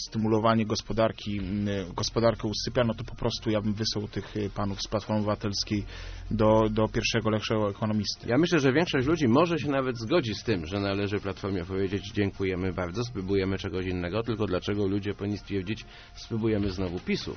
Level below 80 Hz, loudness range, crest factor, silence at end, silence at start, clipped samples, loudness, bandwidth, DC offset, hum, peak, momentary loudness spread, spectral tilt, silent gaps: -46 dBFS; 5 LU; 18 dB; 0 s; 0 s; under 0.1%; -28 LUFS; 6.6 kHz; under 0.1%; none; -10 dBFS; 9 LU; -5 dB/octave; none